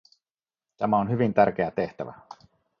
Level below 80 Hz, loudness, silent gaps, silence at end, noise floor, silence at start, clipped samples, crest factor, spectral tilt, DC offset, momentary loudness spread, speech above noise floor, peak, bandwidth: -60 dBFS; -25 LUFS; none; 0.45 s; under -90 dBFS; 0.8 s; under 0.1%; 22 dB; -9 dB/octave; under 0.1%; 14 LU; over 66 dB; -6 dBFS; 6.6 kHz